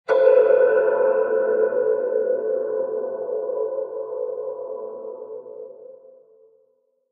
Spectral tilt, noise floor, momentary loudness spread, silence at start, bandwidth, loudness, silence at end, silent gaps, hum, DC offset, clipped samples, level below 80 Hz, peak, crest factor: -6.5 dB/octave; -65 dBFS; 19 LU; 0.1 s; 4.8 kHz; -21 LUFS; 1.15 s; none; none; under 0.1%; under 0.1%; -80 dBFS; -4 dBFS; 18 dB